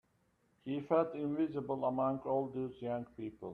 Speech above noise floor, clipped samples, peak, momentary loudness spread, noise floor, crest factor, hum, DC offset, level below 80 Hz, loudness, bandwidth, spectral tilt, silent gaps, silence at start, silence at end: 39 dB; under 0.1%; -18 dBFS; 10 LU; -75 dBFS; 20 dB; none; under 0.1%; -72 dBFS; -37 LUFS; 4.7 kHz; -9.5 dB/octave; none; 0.65 s; 0 s